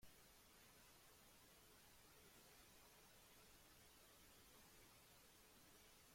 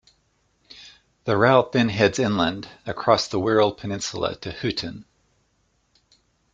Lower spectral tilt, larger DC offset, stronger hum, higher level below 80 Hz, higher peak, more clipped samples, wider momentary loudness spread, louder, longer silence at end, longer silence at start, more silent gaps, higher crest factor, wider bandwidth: second, -2 dB/octave vs -5 dB/octave; neither; neither; second, -80 dBFS vs -56 dBFS; second, -54 dBFS vs -2 dBFS; neither; second, 1 LU vs 17 LU; second, -68 LUFS vs -22 LUFS; second, 0 s vs 1.5 s; second, 0 s vs 0.75 s; neither; second, 16 dB vs 22 dB; first, 16.5 kHz vs 9.4 kHz